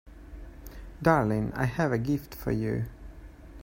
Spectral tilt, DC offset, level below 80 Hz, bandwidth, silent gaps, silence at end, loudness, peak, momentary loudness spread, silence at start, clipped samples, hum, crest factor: -8 dB/octave; under 0.1%; -46 dBFS; 16.5 kHz; none; 0 s; -28 LUFS; -8 dBFS; 24 LU; 0.05 s; under 0.1%; none; 22 dB